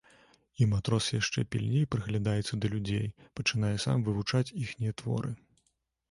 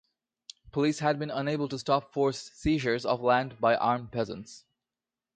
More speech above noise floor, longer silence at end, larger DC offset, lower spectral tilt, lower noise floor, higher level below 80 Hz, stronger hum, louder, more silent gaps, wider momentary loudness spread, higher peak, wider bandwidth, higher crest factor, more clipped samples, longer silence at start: second, 47 dB vs over 62 dB; about the same, 0.75 s vs 0.75 s; neither; about the same, -5.5 dB/octave vs -5.5 dB/octave; second, -77 dBFS vs under -90 dBFS; about the same, -54 dBFS vs -54 dBFS; neither; about the same, -31 LUFS vs -29 LUFS; neither; about the same, 6 LU vs 8 LU; second, -14 dBFS vs -10 dBFS; first, 11.5 kHz vs 9.4 kHz; about the same, 18 dB vs 20 dB; neither; about the same, 0.6 s vs 0.65 s